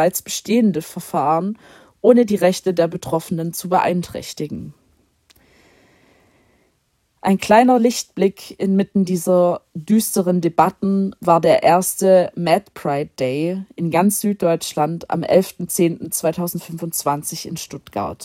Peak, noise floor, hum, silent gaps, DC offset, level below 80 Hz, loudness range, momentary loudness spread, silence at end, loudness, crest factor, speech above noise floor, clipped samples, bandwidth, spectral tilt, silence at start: 0 dBFS; -66 dBFS; none; none; under 0.1%; -58 dBFS; 8 LU; 13 LU; 0 s; -18 LUFS; 18 dB; 48 dB; under 0.1%; 16.5 kHz; -5.5 dB/octave; 0 s